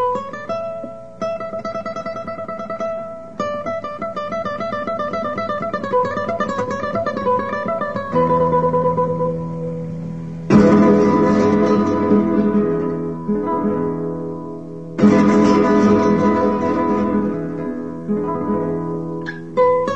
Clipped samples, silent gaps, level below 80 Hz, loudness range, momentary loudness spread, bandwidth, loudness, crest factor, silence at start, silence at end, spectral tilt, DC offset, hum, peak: under 0.1%; none; -46 dBFS; 10 LU; 14 LU; 8 kHz; -19 LUFS; 18 dB; 0 s; 0 s; -8 dB/octave; 0.8%; none; 0 dBFS